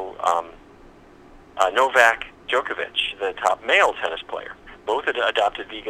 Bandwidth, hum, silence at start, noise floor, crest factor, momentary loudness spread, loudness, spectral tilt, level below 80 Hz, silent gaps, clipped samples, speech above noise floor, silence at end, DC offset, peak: 16 kHz; none; 0 s; -48 dBFS; 22 dB; 16 LU; -21 LUFS; -1.5 dB/octave; -54 dBFS; none; under 0.1%; 26 dB; 0 s; under 0.1%; 0 dBFS